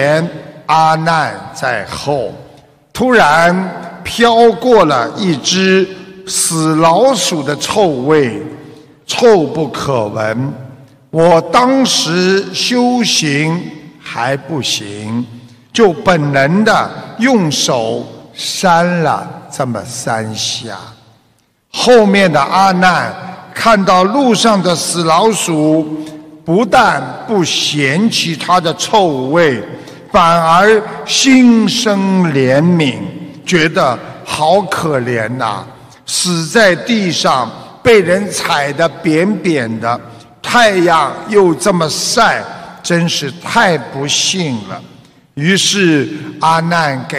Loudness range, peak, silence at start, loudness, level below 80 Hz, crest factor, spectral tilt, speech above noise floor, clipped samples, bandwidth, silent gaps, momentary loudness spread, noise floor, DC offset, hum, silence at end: 4 LU; 0 dBFS; 0 s; -12 LUFS; -48 dBFS; 12 dB; -4 dB/octave; 43 dB; under 0.1%; 15.5 kHz; none; 13 LU; -55 dBFS; under 0.1%; none; 0 s